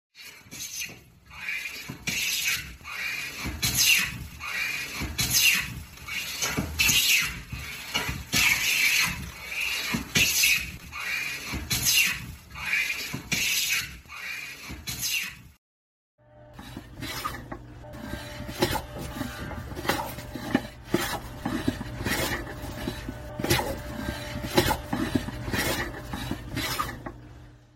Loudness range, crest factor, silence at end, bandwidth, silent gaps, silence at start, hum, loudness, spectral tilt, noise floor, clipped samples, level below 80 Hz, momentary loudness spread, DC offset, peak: 11 LU; 24 dB; 0.1 s; 16.5 kHz; 15.58-16.18 s; 0.15 s; none; -26 LUFS; -2 dB/octave; under -90 dBFS; under 0.1%; -44 dBFS; 17 LU; under 0.1%; -4 dBFS